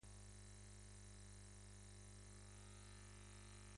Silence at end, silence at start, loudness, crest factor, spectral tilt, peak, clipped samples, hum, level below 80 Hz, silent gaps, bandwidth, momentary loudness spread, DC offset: 0 s; 0 s; -61 LUFS; 12 dB; -4 dB/octave; -48 dBFS; under 0.1%; 50 Hz at -60 dBFS; -64 dBFS; none; 11.5 kHz; 1 LU; under 0.1%